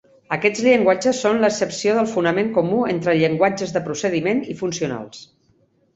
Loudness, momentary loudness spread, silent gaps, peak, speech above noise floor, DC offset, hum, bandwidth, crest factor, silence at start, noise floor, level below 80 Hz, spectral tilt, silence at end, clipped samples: -19 LUFS; 10 LU; none; -2 dBFS; 41 dB; under 0.1%; none; 8.2 kHz; 18 dB; 0.3 s; -61 dBFS; -60 dBFS; -5 dB/octave; 0.7 s; under 0.1%